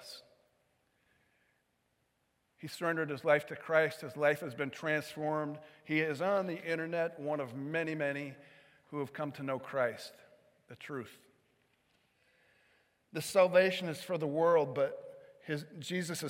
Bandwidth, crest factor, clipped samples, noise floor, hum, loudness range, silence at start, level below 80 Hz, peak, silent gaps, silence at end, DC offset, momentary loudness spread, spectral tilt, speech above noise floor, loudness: 16.5 kHz; 22 dB; under 0.1%; -78 dBFS; none; 10 LU; 0 s; -86 dBFS; -14 dBFS; none; 0 s; under 0.1%; 18 LU; -5 dB/octave; 44 dB; -34 LUFS